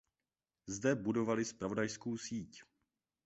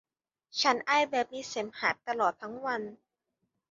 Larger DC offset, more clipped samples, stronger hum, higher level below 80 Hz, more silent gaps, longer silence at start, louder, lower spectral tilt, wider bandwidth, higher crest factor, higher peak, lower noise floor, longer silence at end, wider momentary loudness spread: neither; neither; neither; first, -70 dBFS vs -76 dBFS; neither; about the same, 0.65 s vs 0.55 s; second, -38 LUFS vs -30 LUFS; first, -5.5 dB/octave vs -2 dB/octave; about the same, 8 kHz vs 7.6 kHz; about the same, 20 dB vs 22 dB; second, -20 dBFS vs -10 dBFS; first, under -90 dBFS vs -82 dBFS; second, 0.6 s vs 0.75 s; about the same, 11 LU vs 10 LU